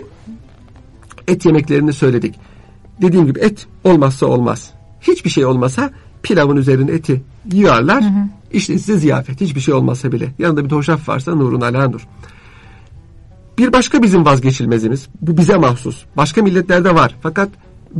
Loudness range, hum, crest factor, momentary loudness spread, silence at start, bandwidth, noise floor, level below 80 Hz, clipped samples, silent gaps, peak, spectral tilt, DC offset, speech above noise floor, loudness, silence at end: 4 LU; none; 12 dB; 9 LU; 0 s; 11.5 kHz; -40 dBFS; -40 dBFS; under 0.1%; none; -2 dBFS; -6.5 dB/octave; under 0.1%; 27 dB; -14 LUFS; 0 s